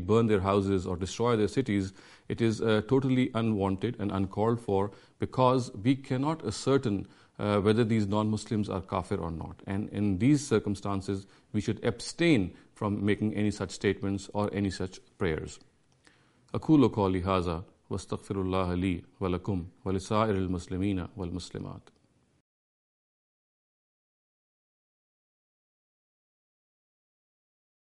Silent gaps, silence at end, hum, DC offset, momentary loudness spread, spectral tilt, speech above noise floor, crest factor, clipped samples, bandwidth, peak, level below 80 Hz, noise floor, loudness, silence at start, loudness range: none; 6 s; none; under 0.1%; 12 LU; -6.5 dB/octave; 35 dB; 20 dB; under 0.1%; 11.5 kHz; -10 dBFS; -56 dBFS; -64 dBFS; -30 LUFS; 0 s; 5 LU